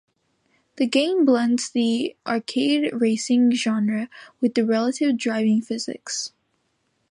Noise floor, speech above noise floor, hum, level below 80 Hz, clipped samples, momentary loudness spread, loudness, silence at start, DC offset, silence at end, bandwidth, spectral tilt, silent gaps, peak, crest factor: -70 dBFS; 49 dB; none; -76 dBFS; under 0.1%; 10 LU; -22 LUFS; 0.75 s; under 0.1%; 0.85 s; 11 kHz; -4 dB/octave; none; -6 dBFS; 16 dB